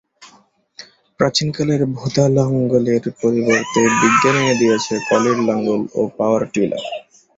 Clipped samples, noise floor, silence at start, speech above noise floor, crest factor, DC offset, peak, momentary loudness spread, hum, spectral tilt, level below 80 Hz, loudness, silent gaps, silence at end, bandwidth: under 0.1%; -53 dBFS; 0.2 s; 37 dB; 16 dB; under 0.1%; -2 dBFS; 7 LU; none; -5 dB/octave; -54 dBFS; -17 LUFS; none; 0.35 s; 8 kHz